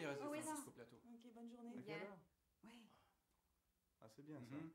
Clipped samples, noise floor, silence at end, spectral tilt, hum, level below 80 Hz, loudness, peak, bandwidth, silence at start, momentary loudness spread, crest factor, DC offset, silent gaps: under 0.1%; -86 dBFS; 0 s; -4.5 dB/octave; none; under -90 dBFS; -54 LUFS; -34 dBFS; 16 kHz; 0 s; 18 LU; 22 dB; under 0.1%; none